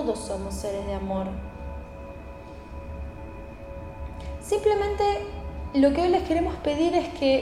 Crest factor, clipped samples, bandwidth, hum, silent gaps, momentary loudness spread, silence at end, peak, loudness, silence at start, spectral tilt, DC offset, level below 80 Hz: 18 dB; under 0.1%; 14.5 kHz; none; none; 18 LU; 0 s; -8 dBFS; -26 LUFS; 0 s; -6 dB/octave; under 0.1%; -38 dBFS